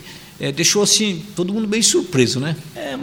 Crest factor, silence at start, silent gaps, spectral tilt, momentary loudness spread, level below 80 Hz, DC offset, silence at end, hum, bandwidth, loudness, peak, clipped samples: 18 dB; 0 s; none; -3 dB/octave; 13 LU; -54 dBFS; under 0.1%; 0 s; none; over 20 kHz; -17 LUFS; 0 dBFS; under 0.1%